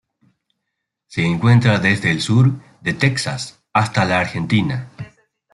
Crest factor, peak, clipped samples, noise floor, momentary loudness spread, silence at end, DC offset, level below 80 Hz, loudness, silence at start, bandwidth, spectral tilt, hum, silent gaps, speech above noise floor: 16 dB; -2 dBFS; under 0.1%; -78 dBFS; 14 LU; 0.45 s; under 0.1%; -54 dBFS; -18 LUFS; 1.1 s; 11.5 kHz; -6 dB/octave; none; none; 62 dB